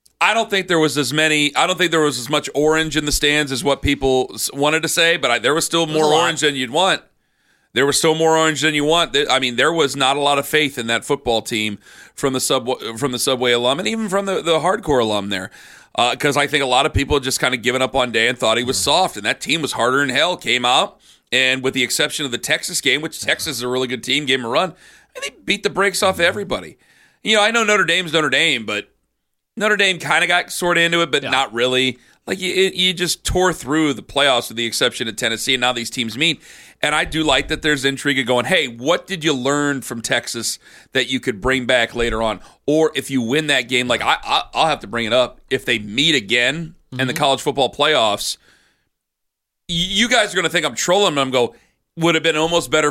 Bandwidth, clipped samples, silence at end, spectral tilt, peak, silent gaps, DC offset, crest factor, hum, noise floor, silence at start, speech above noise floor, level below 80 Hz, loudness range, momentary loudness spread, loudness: 16.5 kHz; under 0.1%; 0 s; -3 dB/octave; -2 dBFS; none; under 0.1%; 16 dB; none; -78 dBFS; 0.2 s; 60 dB; -42 dBFS; 3 LU; 7 LU; -17 LUFS